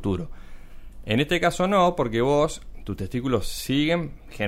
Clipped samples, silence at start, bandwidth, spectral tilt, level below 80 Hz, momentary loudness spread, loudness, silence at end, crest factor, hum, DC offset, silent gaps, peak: under 0.1%; 0 s; 16 kHz; -5.5 dB/octave; -40 dBFS; 16 LU; -24 LUFS; 0 s; 18 dB; none; under 0.1%; none; -6 dBFS